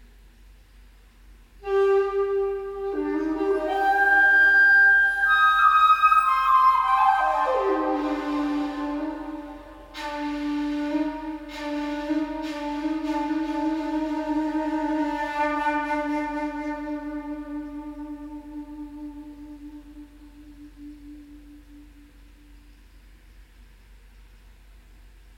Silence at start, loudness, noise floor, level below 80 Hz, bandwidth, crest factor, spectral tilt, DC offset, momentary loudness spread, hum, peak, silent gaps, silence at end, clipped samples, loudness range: 1.3 s; -22 LUFS; -51 dBFS; -50 dBFS; 17.5 kHz; 18 dB; -4.5 dB/octave; under 0.1%; 22 LU; none; -8 dBFS; none; 0.3 s; under 0.1%; 20 LU